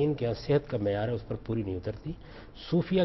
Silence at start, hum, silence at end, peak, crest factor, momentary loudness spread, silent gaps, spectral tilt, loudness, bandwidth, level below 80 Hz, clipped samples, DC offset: 0 s; none; 0 s; -14 dBFS; 16 dB; 15 LU; none; -9 dB/octave; -31 LUFS; 6 kHz; -50 dBFS; under 0.1%; under 0.1%